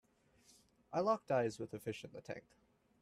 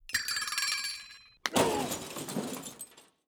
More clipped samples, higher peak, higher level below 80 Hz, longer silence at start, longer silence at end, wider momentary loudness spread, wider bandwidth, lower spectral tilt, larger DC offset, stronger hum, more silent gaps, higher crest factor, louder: neither; second, -22 dBFS vs -8 dBFS; second, -78 dBFS vs -64 dBFS; first, 0.9 s vs 0.05 s; first, 0.6 s vs 0.25 s; about the same, 15 LU vs 16 LU; second, 14.5 kHz vs over 20 kHz; first, -6 dB/octave vs -2 dB/octave; neither; neither; neither; second, 20 dB vs 26 dB; second, -40 LUFS vs -32 LUFS